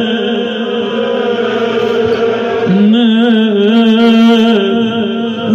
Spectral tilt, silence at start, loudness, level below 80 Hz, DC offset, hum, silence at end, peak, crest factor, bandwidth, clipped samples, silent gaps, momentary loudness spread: -6.5 dB/octave; 0 s; -11 LUFS; -56 dBFS; under 0.1%; none; 0 s; 0 dBFS; 10 dB; 7.2 kHz; under 0.1%; none; 8 LU